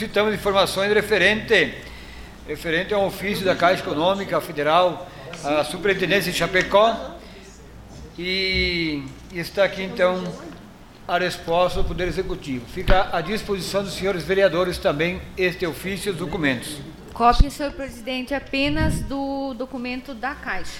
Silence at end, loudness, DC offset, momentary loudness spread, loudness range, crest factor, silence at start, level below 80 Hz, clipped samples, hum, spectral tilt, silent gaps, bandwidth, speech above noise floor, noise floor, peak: 0 s; -22 LUFS; under 0.1%; 15 LU; 3 LU; 20 dB; 0 s; -34 dBFS; under 0.1%; none; -4.5 dB/octave; none; 16.5 kHz; 21 dB; -43 dBFS; -4 dBFS